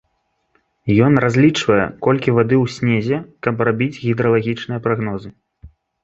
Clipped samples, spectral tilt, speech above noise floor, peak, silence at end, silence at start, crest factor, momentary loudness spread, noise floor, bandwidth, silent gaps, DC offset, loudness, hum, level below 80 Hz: under 0.1%; -7 dB/octave; 52 dB; 0 dBFS; 0.35 s; 0.85 s; 18 dB; 9 LU; -68 dBFS; 8 kHz; none; under 0.1%; -17 LUFS; none; -48 dBFS